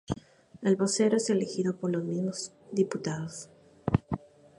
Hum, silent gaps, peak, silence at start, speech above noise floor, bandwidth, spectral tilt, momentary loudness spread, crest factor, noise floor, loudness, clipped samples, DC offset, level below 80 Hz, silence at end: none; none; -8 dBFS; 0.1 s; 22 dB; 11.5 kHz; -5.5 dB/octave; 13 LU; 22 dB; -51 dBFS; -30 LUFS; under 0.1%; under 0.1%; -54 dBFS; 0.4 s